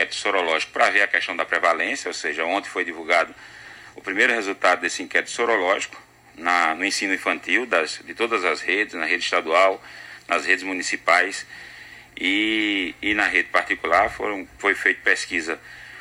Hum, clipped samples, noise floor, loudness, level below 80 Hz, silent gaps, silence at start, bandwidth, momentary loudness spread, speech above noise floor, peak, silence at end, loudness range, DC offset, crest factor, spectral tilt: none; under 0.1%; -42 dBFS; -21 LUFS; -58 dBFS; none; 0 s; 16 kHz; 14 LU; 19 dB; -4 dBFS; 0 s; 2 LU; under 0.1%; 20 dB; -1.5 dB/octave